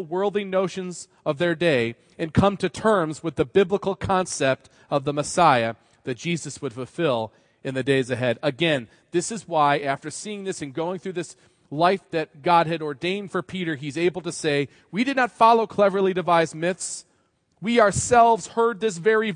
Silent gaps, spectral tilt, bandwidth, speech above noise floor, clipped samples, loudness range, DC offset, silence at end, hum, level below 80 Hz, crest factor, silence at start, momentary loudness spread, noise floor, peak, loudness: none; -5 dB/octave; 10.5 kHz; 44 dB; under 0.1%; 4 LU; under 0.1%; 0 s; none; -54 dBFS; 20 dB; 0 s; 13 LU; -66 dBFS; -4 dBFS; -23 LUFS